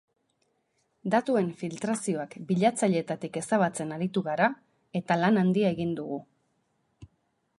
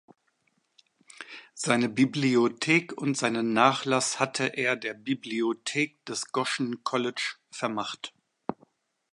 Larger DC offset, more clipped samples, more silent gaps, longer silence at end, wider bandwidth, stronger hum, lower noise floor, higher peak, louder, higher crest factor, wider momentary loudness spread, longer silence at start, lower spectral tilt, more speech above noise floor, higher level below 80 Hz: neither; neither; neither; about the same, 0.55 s vs 0.6 s; about the same, 11.5 kHz vs 11.5 kHz; neither; about the same, -74 dBFS vs -73 dBFS; about the same, -8 dBFS vs -6 dBFS; about the same, -28 LUFS vs -27 LUFS; about the same, 20 dB vs 22 dB; second, 11 LU vs 15 LU; second, 1.05 s vs 1.2 s; first, -6 dB/octave vs -4 dB/octave; about the same, 47 dB vs 45 dB; first, -70 dBFS vs -76 dBFS